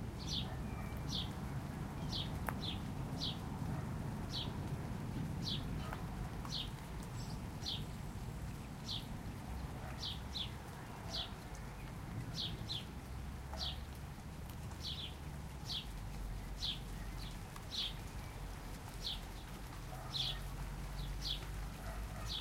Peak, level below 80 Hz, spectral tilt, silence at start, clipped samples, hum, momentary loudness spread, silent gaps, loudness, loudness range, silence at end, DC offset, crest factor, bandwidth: -18 dBFS; -50 dBFS; -4.5 dB/octave; 0 s; under 0.1%; none; 8 LU; none; -44 LUFS; 3 LU; 0 s; under 0.1%; 24 dB; 16 kHz